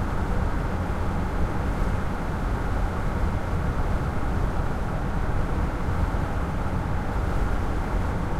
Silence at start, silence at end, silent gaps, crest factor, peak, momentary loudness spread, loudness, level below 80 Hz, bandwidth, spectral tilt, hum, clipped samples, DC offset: 0 s; 0 s; none; 12 dB; -12 dBFS; 1 LU; -28 LUFS; -28 dBFS; 13.5 kHz; -7.5 dB/octave; none; under 0.1%; under 0.1%